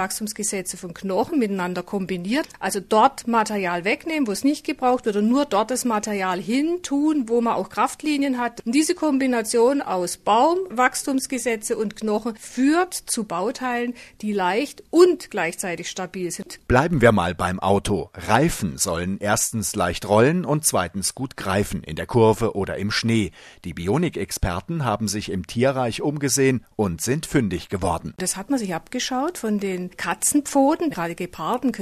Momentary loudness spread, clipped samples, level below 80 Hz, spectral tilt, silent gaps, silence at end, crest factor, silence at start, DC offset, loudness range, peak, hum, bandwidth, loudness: 9 LU; under 0.1%; -44 dBFS; -4.5 dB/octave; none; 0 s; 22 dB; 0 s; under 0.1%; 3 LU; 0 dBFS; none; 14 kHz; -22 LUFS